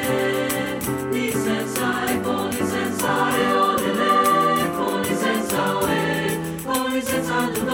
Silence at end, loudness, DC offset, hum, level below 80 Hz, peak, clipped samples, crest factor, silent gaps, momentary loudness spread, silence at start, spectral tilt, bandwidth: 0 s; -21 LUFS; under 0.1%; none; -52 dBFS; -6 dBFS; under 0.1%; 16 dB; none; 6 LU; 0 s; -4 dB/octave; over 20 kHz